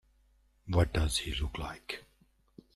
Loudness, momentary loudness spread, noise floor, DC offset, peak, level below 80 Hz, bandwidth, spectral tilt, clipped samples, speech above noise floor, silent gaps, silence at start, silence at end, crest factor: -33 LUFS; 13 LU; -68 dBFS; under 0.1%; -16 dBFS; -42 dBFS; 13.5 kHz; -4.5 dB/octave; under 0.1%; 37 dB; none; 0.65 s; 0.75 s; 20 dB